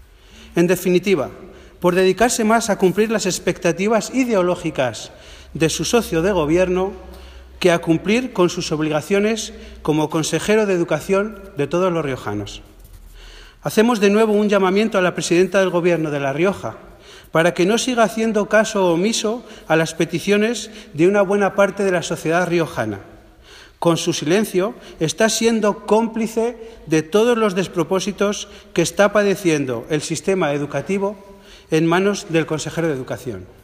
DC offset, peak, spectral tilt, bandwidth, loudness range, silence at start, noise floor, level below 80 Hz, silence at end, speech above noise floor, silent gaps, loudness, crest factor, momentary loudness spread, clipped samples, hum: under 0.1%; -2 dBFS; -5 dB/octave; 15.5 kHz; 3 LU; 0.35 s; -44 dBFS; -46 dBFS; 0.15 s; 26 dB; none; -18 LUFS; 18 dB; 10 LU; under 0.1%; none